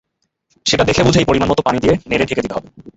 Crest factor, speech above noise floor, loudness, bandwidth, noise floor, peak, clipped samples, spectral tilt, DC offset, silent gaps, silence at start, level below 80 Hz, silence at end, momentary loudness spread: 16 dB; 50 dB; -15 LUFS; 8.2 kHz; -66 dBFS; 0 dBFS; under 0.1%; -5 dB/octave; under 0.1%; none; 0.65 s; -36 dBFS; 0.05 s; 9 LU